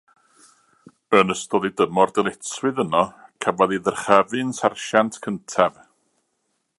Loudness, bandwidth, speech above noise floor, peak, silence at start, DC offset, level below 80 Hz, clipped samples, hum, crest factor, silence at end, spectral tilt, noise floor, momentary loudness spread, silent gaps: -21 LUFS; 11.5 kHz; 52 dB; 0 dBFS; 1.1 s; under 0.1%; -62 dBFS; under 0.1%; none; 22 dB; 1.1 s; -4.5 dB/octave; -73 dBFS; 8 LU; none